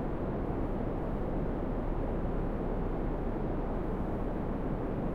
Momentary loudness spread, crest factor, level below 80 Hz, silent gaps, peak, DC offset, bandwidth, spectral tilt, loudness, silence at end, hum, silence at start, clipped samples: 1 LU; 12 dB; -36 dBFS; none; -22 dBFS; under 0.1%; 4.3 kHz; -10 dB/octave; -35 LUFS; 0 s; none; 0 s; under 0.1%